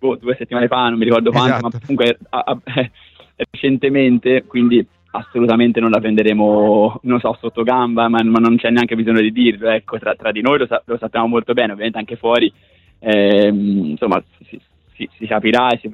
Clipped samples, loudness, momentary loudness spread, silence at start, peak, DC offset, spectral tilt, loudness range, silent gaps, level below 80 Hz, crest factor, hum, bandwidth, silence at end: under 0.1%; -15 LUFS; 8 LU; 0 s; -2 dBFS; under 0.1%; -7.5 dB/octave; 3 LU; none; -54 dBFS; 14 dB; none; 7.2 kHz; 0 s